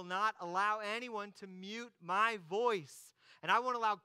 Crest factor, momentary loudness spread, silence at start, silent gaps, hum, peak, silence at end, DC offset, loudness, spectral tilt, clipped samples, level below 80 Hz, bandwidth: 20 dB; 14 LU; 0 s; none; none; -16 dBFS; 0.05 s; under 0.1%; -36 LUFS; -3.5 dB/octave; under 0.1%; under -90 dBFS; 16 kHz